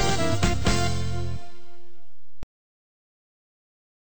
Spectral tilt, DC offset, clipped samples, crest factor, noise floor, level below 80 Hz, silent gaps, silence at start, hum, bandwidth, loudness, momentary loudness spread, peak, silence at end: -4.5 dB/octave; 6%; under 0.1%; 22 dB; -63 dBFS; -38 dBFS; none; 0 s; none; over 20 kHz; -26 LUFS; 24 LU; -6 dBFS; 2.55 s